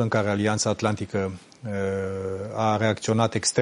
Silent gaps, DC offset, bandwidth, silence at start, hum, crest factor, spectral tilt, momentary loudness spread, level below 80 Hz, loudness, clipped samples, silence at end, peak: none; under 0.1%; 11 kHz; 0 s; none; 18 dB; -4.5 dB/octave; 8 LU; -60 dBFS; -25 LUFS; under 0.1%; 0 s; -6 dBFS